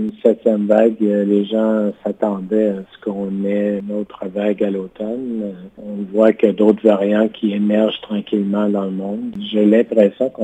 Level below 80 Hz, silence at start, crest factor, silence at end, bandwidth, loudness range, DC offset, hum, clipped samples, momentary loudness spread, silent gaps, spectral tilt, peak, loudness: -62 dBFS; 0 s; 16 dB; 0 s; 8 kHz; 5 LU; under 0.1%; none; under 0.1%; 11 LU; none; -8.5 dB/octave; 0 dBFS; -17 LUFS